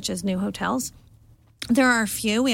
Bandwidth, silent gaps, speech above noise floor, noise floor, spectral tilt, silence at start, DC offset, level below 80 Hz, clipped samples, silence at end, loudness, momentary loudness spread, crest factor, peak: 17.5 kHz; none; 31 dB; -54 dBFS; -3.5 dB/octave; 0 s; under 0.1%; -52 dBFS; under 0.1%; 0 s; -23 LUFS; 11 LU; 16 dB; -8 dBFS